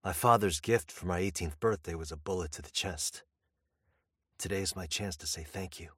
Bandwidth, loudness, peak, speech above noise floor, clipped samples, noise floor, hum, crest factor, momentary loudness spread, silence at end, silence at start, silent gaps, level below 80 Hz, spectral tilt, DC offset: 16.5 kHz; -33 LUFS; -10 dBFS; 49 dB; under 0.1%; -82 dBFS; none; 24 dB; 13 LU; 0.05 s; 0.05 s; none; -52 dBFS; -4 dB/octave; under 0.1%